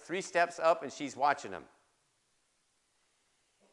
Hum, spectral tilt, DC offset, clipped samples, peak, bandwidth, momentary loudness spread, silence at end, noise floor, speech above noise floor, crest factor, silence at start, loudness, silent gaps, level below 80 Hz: none; -3.5 dB/octave; under 0.1%; under 0.1%; -14 dBFS; 11.5 kHz; 14 LU; 2.1 s; -76 dBFS; 43 dB; 22 dB; 0 s; -32 LUFS; none; -84 dBFS